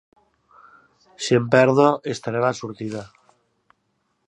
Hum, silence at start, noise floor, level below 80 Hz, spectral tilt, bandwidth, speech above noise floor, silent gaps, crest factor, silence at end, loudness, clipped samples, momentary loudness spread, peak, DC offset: none; 1.2 s; -71 dBFS; -66 dBFS; -5.5 dB/octave; 11 kHz; 51 dB; none; 22 dB; 1.2 s; -20 LUFS; under 0.1%; 15 LU; -2 dBFS; under 0.1%